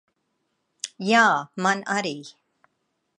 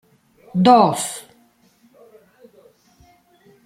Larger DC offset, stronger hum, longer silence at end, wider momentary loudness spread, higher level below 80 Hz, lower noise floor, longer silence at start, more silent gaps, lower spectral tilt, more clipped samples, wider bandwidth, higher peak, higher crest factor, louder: neither; neither; second, 0.9 s vs 2.45 s; about the same, 18 LU vs 16 LU; second, -80 dBFS vs -64 dBFS; first, -75 dBFS vs -57 dBFS; first, 0.85 s vs 0.55 s; neither; second, -3.5 dB/octave vs -5.5 dB/octave; neither; second, 11.5 kHz vs 15.5 kHz; about the same, -4 dBFS vs -2 dBFS; about the same, 20 dB vs 20 dB; second, -22 LUFS vs -16 LUFS